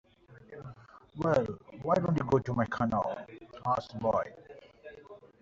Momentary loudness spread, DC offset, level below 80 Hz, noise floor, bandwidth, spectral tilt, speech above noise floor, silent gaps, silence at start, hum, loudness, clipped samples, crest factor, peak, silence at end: 22 LU; under 0.1%; -60 dBFS; -55 dBFS; 7.8 kHz; -7 dB/octave; 24 dB; none; 0.3 s; none; -31 LUFS; under 0.1%; 20 dB; -14 dBFS; 0.15 s